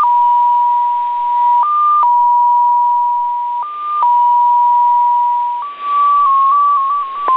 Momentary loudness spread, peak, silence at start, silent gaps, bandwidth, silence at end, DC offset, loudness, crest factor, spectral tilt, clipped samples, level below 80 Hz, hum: 7 LU; -4 dBFS; 0 s; none; 4.1 kHz; 0 s; under 0.1%; -12 LUFS; 8 dB; -3.5 dB/octave; under 0.1%; -68 dBFS; none